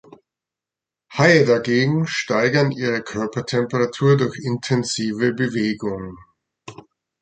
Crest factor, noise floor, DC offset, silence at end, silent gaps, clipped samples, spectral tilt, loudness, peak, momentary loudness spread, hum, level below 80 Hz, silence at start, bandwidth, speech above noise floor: 18 dB; -88 dBFS; under 0.1%; 0.5 s; none; under 0.1%; -5.5 dB/octave; -19 LUFS; -2 dBFS; 11 LU; none; -56 dBFS; 1.1 s; 9.2 kHz; 69 dB